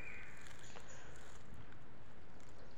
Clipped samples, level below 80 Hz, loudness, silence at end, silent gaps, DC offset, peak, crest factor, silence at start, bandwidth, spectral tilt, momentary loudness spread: under 0.1%; -64 dBFS; -57 LUFS; 0 s; none; 1%; -32 dBFS; 22 dB; 0 s; 19.5 kHz; -4 dB/octave; 7 LU